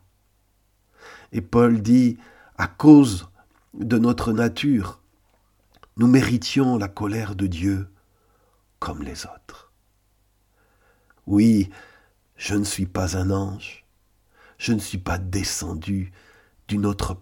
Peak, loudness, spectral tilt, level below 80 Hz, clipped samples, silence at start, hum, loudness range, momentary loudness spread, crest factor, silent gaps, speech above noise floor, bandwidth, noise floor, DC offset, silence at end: 0 dBFS; -21 LUFS; -6 dB/octave; -44 dBFS; under 0.1%; 1.05 s; none; 11 LU; 17 LU; 22 dB; none; 44 dB; 17 kHz; -64 dBFS; under 0.1%; 0.05 s